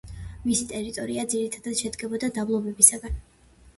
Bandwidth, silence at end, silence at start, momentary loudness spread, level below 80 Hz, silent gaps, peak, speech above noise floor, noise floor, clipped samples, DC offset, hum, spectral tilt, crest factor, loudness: 12 kHz; 0.1 s; 0.05 s; 18 LU; -44 dBFS; none; 0 dBFS; 29 dB; -55 dBFS; under 0.1%; under 0.1%; none; -3 dB/octave; 26 dB; -23 LUFS